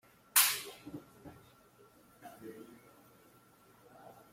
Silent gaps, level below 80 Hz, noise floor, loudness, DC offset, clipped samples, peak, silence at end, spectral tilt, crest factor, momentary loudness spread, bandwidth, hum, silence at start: none; -78 dBFS; -64 dBFS; -29 LUFS; under 0.1%; under 0.1%; -10 dBFS; 1.6 s; 0.5 dB/octave; 30 dB; 29 LU; 16.5 kHz; none; 0.35 s